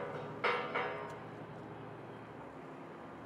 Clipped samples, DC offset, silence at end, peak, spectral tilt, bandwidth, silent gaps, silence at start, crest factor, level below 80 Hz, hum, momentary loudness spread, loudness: under 0.1%; under 0.1%; 0 s; -20 dBFS; -6 dB/octave; 12.5 kHz; none; 0 s; 22 dB; -74 dBFS; none; 14 LU; -41 LUFS